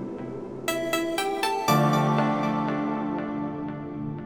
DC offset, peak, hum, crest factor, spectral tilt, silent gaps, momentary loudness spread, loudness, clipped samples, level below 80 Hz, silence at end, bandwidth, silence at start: under 0.1%; -8 dBFS; none; 18 dB; -5.5 dB/octave; none; 12 LU; -26 LUFS; under 0.1%; -60 dBFS; 0 s; over 20 kHz; 0 s